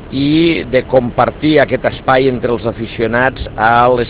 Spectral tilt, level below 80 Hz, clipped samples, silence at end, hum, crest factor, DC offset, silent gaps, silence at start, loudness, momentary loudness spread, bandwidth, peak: -10 dB/octave; -34 dBFS; under 0.1%; 0 s; none; 12 dB; under 0.1%; none; 0 s; -13 LUFS; 6 LU; 4 kHz; 0 dBFS